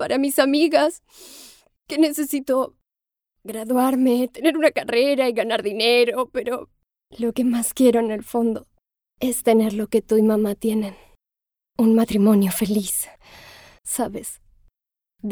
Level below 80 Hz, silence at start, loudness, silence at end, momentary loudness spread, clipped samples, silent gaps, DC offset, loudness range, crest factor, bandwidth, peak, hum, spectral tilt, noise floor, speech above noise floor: -56 dBFS; 0 s; -20 LUFS; 0 s; 15 LU; under 0.1%; none; under 0.1%; 3 LU; 18 dB; over 20 kHz; -4 dBFS; none; -4.5 dB/octave; -88 dBFS; 68 dB